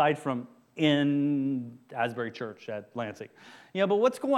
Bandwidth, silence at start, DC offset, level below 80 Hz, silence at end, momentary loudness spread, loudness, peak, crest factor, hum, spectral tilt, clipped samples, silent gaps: 12.5 kHz; 0 s; under 0.1%; -78 dBFS; 0 s; 15 LU; -29 LUFS; -10 dBFS; 18 dB; none; -6.5 dB/octave; under 0.1%; none